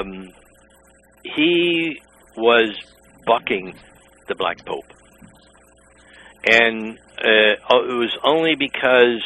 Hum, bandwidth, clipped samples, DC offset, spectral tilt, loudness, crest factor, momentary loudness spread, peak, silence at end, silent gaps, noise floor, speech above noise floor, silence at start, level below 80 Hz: none; 11 kHz; under 0.1%; under 0.1%; -4.5 dB/octave; -18 LUFS; 20 dB; 18 LU; 0 dBFS; 0 s; none; -53 dBFS; 34 dB; 0 s; -58 dBFS